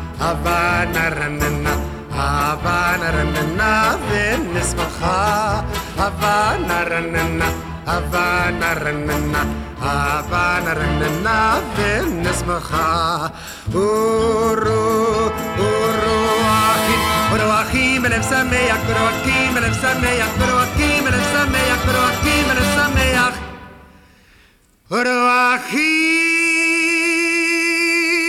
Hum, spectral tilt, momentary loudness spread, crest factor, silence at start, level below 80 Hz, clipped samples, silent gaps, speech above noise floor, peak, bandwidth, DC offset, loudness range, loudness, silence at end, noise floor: none; -4 dB/octave; 6 LU; 14 dB; 0 s; -30 dBFS; under 0.1%; none; 35 dB; -4 dBFS; 17 kHz; under 0.1%; 3 LU; -17 LUFS; 0 s; -52 dBFS